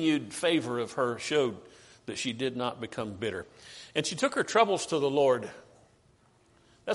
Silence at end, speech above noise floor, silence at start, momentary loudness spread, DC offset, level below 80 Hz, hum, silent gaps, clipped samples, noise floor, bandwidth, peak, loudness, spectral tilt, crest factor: 0 s; 34 dB; 0 s; 17 LU; under 0.1%; -70 dBFS; none; none; under 0.1%; -64 dBFS; 11.5 kHz; -10 dBFS; -29 LUFS; -4 dB/octave; 20 dB